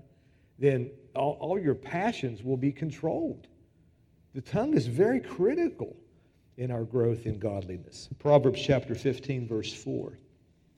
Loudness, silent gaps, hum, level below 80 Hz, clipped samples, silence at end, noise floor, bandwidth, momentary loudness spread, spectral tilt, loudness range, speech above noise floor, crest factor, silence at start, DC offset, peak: -29 LUFS; none; none; -60 dBFS; under 0.1%; 0.6 s; -63 dBFS; 11.5 kHz; 14 LU; -7.5 dB/octave; 3 LU; 35 dB; 22 dB; 0.6 s; under 0.1%; -8 dBFS